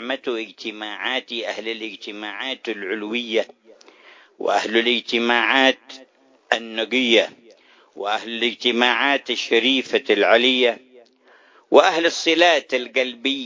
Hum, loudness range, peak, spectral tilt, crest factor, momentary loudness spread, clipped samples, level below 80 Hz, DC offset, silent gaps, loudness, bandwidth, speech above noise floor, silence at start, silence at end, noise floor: none; 8 LU; 0 dBFS; -2 dB/octave; 22 dB; 13 LU; under 0.1%; -76 dBFS; under 0.1%; none; -19 LUFS; 7.6 kHz; 33 dB; 0 s; 0 s; -54 dBFS